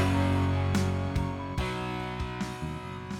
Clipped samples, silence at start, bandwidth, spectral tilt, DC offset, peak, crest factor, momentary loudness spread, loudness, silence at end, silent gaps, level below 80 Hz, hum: under 0.1%; 0 s; 13.5 kHz; -6.5 dB/octave; under 0.1%; -16 dBFS; 14 dB; 9 LU; -31 LUFS; 0 s; none; -42 dBFS; none